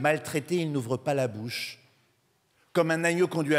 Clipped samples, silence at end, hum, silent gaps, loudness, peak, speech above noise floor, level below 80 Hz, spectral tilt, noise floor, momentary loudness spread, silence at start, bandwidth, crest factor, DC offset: under 0.1%; 0 s; none; none; -28 LUFS; -10 dBFS; 42 dB; -76 dBFS; -5.5 dB/octave; -69 dBFS; 9 LU; 0 s; 16 kHz; 18 dB; under 0.1%